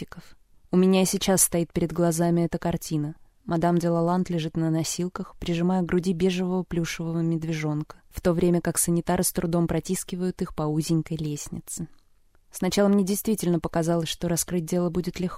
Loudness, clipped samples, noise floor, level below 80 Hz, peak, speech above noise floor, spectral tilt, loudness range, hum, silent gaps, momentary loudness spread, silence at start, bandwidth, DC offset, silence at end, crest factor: -25 LUFS; under 0.1%; -59 dBFS; -48 dBFS; -8 dBFS; 34 dB; -5.5 dB/octave; 3 LU; none; none; 10 LU; 0 s; 16 kHz; under 0.1%; 0 s; 18 dB